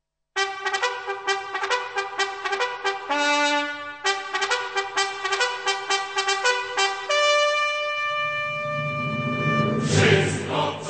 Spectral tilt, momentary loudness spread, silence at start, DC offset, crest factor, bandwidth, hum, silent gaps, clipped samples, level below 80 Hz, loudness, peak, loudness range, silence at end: -3.5 dB/octave; 7 LU; 0.35 s; 0.1%; 18 dB; 9.2 kHz; none; none; under 0.1%; -62 dBFS; -23 LUFS; -6 dBFS; 2 LU; 0 s